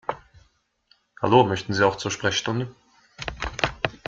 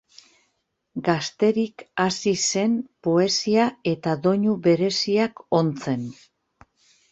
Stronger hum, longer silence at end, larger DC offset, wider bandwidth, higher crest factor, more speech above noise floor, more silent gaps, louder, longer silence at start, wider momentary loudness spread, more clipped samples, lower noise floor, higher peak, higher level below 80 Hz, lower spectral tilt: neither; second, 0.1 s vs 1 s; neither; about the same, 7.8 kHz vs 8.4 kHz; about the same, 22 dB vs 18 dB; second, 42 dB vs 52 dB; neither; about the same, -23 LUFS vs -22 LUFS; second, 0.1 s vs 0.95 s; first, 16 LU vs 8 LU; neither; second, -64 dBFS vs -74 dBFS; about the same, -4 dBFS vs -4 dBFS; first, -46 dBFS vs -64 dBFS; about the same, -4.5 dB/octave vs -4.5 dB/octave